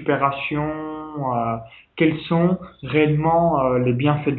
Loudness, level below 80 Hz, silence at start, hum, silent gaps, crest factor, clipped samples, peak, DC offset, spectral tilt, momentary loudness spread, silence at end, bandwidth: -21 LUFS; -50 dBFS; 0 s; none; none; 16 dB; under 0.1%; -4 dBFS; under 0.1%; -12 dB/octave; 10 LU; 0 s; 4.3 kHz